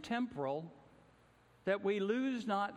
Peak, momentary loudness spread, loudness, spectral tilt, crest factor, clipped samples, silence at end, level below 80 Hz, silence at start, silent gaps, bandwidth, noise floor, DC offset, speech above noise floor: -22 dBFS; 9 LU; -37 LUFS; -6 dB/octave; 16 dB; under 0.1%; 0 s; -76 dBFS; 0 s; none; 11 kHz; -67 dBFS; under 0.1%; 30 dB